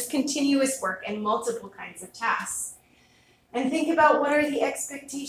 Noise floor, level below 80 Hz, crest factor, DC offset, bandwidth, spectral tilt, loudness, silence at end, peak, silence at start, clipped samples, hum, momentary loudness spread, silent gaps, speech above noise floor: -60 dBFS; -66 dBFS; 20 dB; under 0.1%; 16 kHz; -2.5 dB/octave; -25 LUFS; 0 s; -6 dBFS; 0 s; under 0.1%; none; 15 LU; none; 35 dB